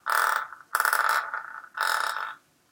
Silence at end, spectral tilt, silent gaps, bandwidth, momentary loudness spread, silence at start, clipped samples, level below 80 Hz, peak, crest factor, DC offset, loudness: 0.35 s; 2.5 dB/octave; none; 17.5 kHz; 13 LU; 0.05 s; under 0.1%; -84 dBFS; -6 dBFS; 22 dB; under 0.1%; -26 LUFS